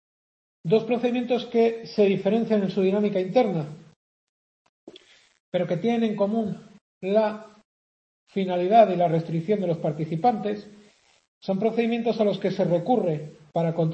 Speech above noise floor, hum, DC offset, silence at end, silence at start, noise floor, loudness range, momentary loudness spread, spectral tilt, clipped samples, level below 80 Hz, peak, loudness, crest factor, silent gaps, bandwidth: 30 dB; none; under 0.1%; 0 s; 0.65 s; -53 dBFS; 4 LU; 10 LU; -8 dB/octave; under 0.1%; -70 dBFS; -4 dBFS; -24 LUFS; 20 dB; 3.96-4.87 s, 5.40-5.52 s, 6.81-7.01 s, 7.65-8.27 s, 11.28-11.41 s; 8.2 kHz